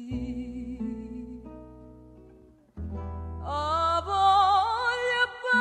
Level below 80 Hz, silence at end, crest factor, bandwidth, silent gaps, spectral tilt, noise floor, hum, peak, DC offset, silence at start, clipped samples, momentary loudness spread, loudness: -46 dBFS; 0 s; 18 dB; 9.8 kHz; none; -4.5 dB/octave; -55 dBFS; none; -10 dBFS; under 0.1%; 0 s; under 0.1%; 20 LU; -26 LUFS